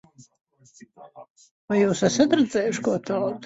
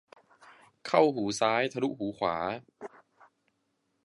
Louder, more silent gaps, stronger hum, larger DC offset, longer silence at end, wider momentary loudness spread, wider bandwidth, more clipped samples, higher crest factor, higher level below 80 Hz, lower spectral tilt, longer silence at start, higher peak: first, -22 LUFS vs -29 LUFS; first, 1.30-1.35 s, 1.51-1.68 s vs none; neither; neither; second, 0 s vs 1.15 s; second, 6 LU vs 22 LU; second, 8 kHz vs 11.5 kHz; neither; about the same, 18 dB vs 22 dB; first, -62 dBFS vs -70 dBFS; about the same, -5 dB/octave vs -4.5 dB/octave; first, 1 s vs 0.45 s; about the same, -6 dBFS vs -8 dBFS